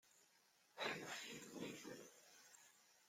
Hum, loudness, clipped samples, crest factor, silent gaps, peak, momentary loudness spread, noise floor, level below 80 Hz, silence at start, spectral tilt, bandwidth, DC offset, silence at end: none; -51 LUFS; under 0.1%; 26 dB; none; -30 dBFS; 18 LU; -76 dBFS; under -90 dBFS; 0.05 s; -2.5 dB/octave; 16.5 kHz; under 0.1%; 0 s